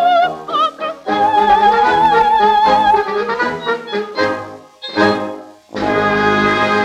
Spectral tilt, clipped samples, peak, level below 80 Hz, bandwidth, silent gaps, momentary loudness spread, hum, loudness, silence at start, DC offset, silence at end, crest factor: -5 dB/octave; under 0.1%; -2 dBFS; -46 dBFS; 12 kHz; none; 12 LU; none; -14 LUFS; 0 s; under 0.1%; 0 s; 12 dB